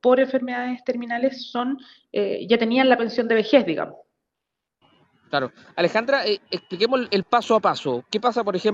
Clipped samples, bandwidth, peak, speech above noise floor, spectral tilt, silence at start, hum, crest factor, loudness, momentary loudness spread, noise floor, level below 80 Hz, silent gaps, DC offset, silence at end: under 0.1%; 7.8 kHz; -2 dBFS; 62 dB; -5.5 dB/octave; 0.05 s; none; 20 dB; -22 LUFS; 10 LU; -83 dBFS; -72 dBFS; none; under 0.1%; 0 s